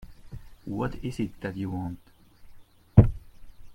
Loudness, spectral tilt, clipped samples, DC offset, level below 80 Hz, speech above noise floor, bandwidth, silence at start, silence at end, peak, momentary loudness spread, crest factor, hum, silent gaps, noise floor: -27 LUFS; -9 dB/octave; under 0.1%; under 0.1%; -38 dBFS; 17 dB; 9.8 kHz; 0 s; 0 s; -2 dBFS; 26 LU; 26 dB; none; none; -49 dBFS